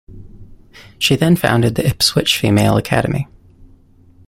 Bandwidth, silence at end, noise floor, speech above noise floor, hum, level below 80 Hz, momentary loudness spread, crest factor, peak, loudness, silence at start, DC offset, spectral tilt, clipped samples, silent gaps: 16.5 kHz; 0.6 s; -47 dBFS; 33 dB; none; -40 dBFS; 7 LU; 16 dB; 0 dBFS; -15 LUFS; 0.1 s; under 0.1%; -5 dB/octave; under 0.1%; none